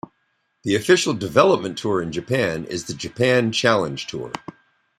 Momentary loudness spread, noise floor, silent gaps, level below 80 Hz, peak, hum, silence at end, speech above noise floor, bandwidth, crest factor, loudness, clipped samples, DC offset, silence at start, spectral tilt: 13 LU; -69 dBFS; none; -56 dBFS; -2 dBFS; none; 0.6 s; 49 dB; 14 kHz; 20 dB; -20 LUFS; under 0.1%; under 0.1%; 0.65 s; -4.5 dB/octave